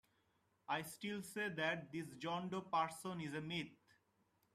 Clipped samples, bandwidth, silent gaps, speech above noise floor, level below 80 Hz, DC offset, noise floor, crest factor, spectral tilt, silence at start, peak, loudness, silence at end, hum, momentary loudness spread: under 0.1%; 15 kHz; none; 36 dB; -82 dBFS; under 0.1%; -80 dBFS; 20 dB; -4.5 dB/octave; 0.7 s; -26 dBFS; -44 LUFS; 0.8 s; none; 7 LU